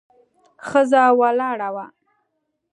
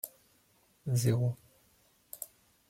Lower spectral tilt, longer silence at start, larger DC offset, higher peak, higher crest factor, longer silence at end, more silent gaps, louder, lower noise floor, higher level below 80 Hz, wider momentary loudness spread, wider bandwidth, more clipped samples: second, -4.5 dB/octave vs -6 dB/octave; first, 0.65 s vs 0.05 s; neither; first, -2 dBFS vs -16 dBFS; about the same, 18 dB vs 20 dB; first, 0.85 s vs 0.45 s; neither; first, -18 LUFS vs -34 LUFS; first, -74 dBFS vs -69 dBFS; about the same, -70 dBFS vs -68 dBFS; about the same, 16 LU vs 18 LU; second, 11 kHz vs 16.5 kHz; neither